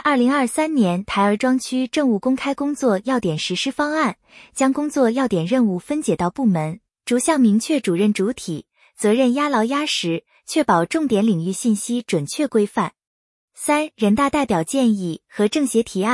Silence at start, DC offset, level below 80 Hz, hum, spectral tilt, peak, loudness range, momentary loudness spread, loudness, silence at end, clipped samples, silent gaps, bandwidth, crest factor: 0.05 s; under 0.1%; -56 dBFS; none; -5 dB/octave; -4 dBFS; 2 LU; 6 LU; -20 LUFS; 0 s; under 0.1%; 13.07-13.48 s; 12 kHz; 16 dB